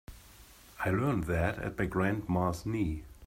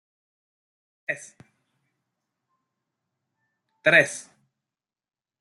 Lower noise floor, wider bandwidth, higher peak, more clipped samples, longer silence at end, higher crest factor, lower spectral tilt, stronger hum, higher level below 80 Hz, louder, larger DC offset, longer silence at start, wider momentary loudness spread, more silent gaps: second, -55 dBFS vs under -90 dBFS; first, 16 kHz vs 12 kHz; second, -16 dBFS vs -2 dBFS; neither; second, 0 s vs 1.2 s; second, 18 dB vs 28 dB; first, -7.5 dB/octave vs -3 dB/octave; neither; first, -48 dBFS vs -78 dBFS; second, -32 LUFS vs -21 LUFS; neither; second, 0.1 s vs 1.1 s; second, 5 LU vs 19 LU; neither